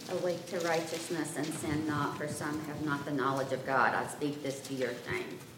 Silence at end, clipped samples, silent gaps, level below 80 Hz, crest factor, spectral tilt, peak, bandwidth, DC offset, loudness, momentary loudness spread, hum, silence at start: 0 s; under 0.1%; none; -68 dBFS; 20 dB; -4.5 dB/octave; -14 dBFS; 16.5 kHz; under 0.1%; -34 LUFS; 7 LU; none; 0 s